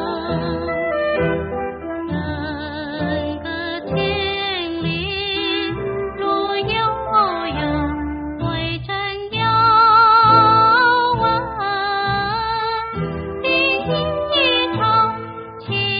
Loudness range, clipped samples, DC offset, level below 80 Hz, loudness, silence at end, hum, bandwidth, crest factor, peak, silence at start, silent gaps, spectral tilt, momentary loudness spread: 9 LU; under 0.1%; under 0.1%; -40 dBFS; -18 LUFS; 0 s; none; 5.2 kHz; 16 dB; -2 dBFS; 0 s; none; -2.5 dB/octave; 14 LU